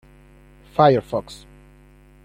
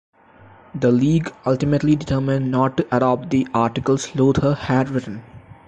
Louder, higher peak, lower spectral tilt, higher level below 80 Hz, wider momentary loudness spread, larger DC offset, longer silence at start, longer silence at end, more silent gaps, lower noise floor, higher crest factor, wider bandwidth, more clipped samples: about the same, -19 LUFS vs -19 LUFS; first, -2 dBFS vs -6 dBFS; about the same, -7 dB/octave vs -7 dB/octave; second, -50 dBFS vs -44 dBFS; first, 25 LU vs 6 LU; neither; about the same, 0.8 s vs 0.75 s; first, 0.9 s vs 0.15 s; neither; about the same, -50 dBFS vs -48 dBFS; first, 22 dB vs 14 dB; first, 15 kHz vs 8.8 kHz; neither